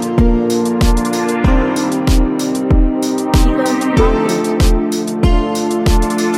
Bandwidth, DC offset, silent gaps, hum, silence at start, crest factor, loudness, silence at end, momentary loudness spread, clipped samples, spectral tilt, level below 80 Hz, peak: 15.5 kHz; under 0.1%; none; none; 0 s; 12 dB; -15 LUFS; 0 s; 3 LU; under 0.1%; -6 dB/octave; -16 dBFS; 0 dBFS